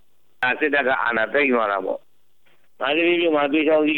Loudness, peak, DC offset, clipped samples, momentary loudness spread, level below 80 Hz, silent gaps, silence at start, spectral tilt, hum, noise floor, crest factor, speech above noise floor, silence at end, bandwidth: -20 LUFS; -8 dBFS; 0.4%; under 0.1%; 8 LU; -68 dBFS; none; 0.4 s; -6.5 dB/octave; none; -64 dBFS; 12 dB; 44 dB; 0 s; 4.3 kHz